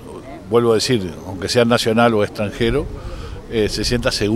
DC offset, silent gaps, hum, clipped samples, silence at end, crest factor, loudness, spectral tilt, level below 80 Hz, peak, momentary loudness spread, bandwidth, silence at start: under 0.1%; none; none; under 0.1%; 0 s; 18 dB; -18 LUFS; -5 dB/octave; -34 dBFS; 0 dBFS; 17 LU; 16 kHz; 0 s